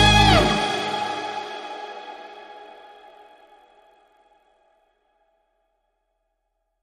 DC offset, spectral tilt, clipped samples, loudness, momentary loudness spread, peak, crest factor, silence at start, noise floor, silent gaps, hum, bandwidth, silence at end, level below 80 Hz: under 0.1%; -4 dB/octave; under 0.1%; -21 LUFS; 27 LU; -4 dBFS; 22 dB; 0 s; -75 dBFS; none; none; 14.5 kHz; 4.15 s; -36 dBFS